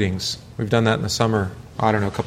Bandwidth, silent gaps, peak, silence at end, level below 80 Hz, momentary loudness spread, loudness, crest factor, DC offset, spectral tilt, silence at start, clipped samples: 16 kHz; none; -4 dBFS; 0 s; -46 dBFS; 8 LU; -22 LUFS; 18 dB; under 0.1%; -5 dB/octave; 0 s; under 0.1%